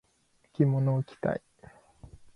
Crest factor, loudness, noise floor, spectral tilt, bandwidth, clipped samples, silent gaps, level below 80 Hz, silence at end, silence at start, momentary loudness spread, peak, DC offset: 20 dB; -29 LUFS; -69 dBFS; -10 dB/octave; 5.4 kHz; under 0.1%; none; -60 dBFS; 0.95 s; 0.6 s; 12 LU; -12 dBFS; under 0.1%